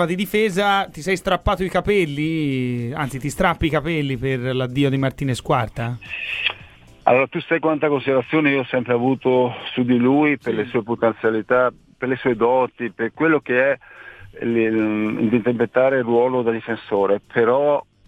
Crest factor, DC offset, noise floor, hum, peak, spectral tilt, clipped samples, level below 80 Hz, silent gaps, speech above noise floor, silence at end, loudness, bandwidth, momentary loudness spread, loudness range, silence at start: 18 dB; under 0.1%; -45 dBFS; none; 0 dBFS; -6.5 dB/octave; under 0.1%; -42 dBFS; none; 25 dB; 0.25 s; -20 LUFS; 16 kHz; 8 LU; 3 LU; 0 s